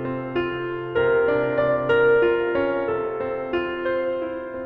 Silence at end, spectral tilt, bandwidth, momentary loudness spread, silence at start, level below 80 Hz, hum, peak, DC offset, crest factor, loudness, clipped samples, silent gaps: 0 s; -8.5 dB/octave; 5 kHz; 9 LU; 0 s; -52 dBFS; none; -10 dBFS; under 0.1%; 14 dB; -22 LUFS; under 0.1%; none